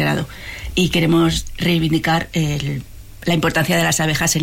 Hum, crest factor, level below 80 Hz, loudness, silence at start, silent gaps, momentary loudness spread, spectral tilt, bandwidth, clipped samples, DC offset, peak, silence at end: none; 12 dB; -36 dBFS; -18 LUFS; 0 s; none; 10 LU; -4.5 dB/octave; 17 kHz; under 0.1%; under 0.1%; -6 dBFS; 0 s